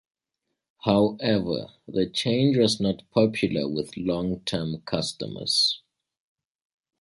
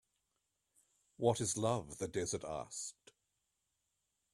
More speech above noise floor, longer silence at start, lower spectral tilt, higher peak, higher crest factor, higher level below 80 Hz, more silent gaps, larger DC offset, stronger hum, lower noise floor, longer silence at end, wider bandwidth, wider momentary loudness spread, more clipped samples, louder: first, 58 dB vs 48 dB; second, 0.85 s vs 1.2 s; about the same, -5 dB/octave vs -4.5 dB/octave; first, -6 dBFS vs -18 dBFS; about the same, 20 dB vs 24 dB; first, -56 dBFS vs -70 dBFS; neither; neither; neither; about the same, -82 dBFS vs -85 dBFS; second, 1.25 s vs 1.4 s; second, 11.5 kHz vs 14 kHz; about the same, 9 LU vs 10 LU; neither; first, -25 LUFS vs -39 LUFS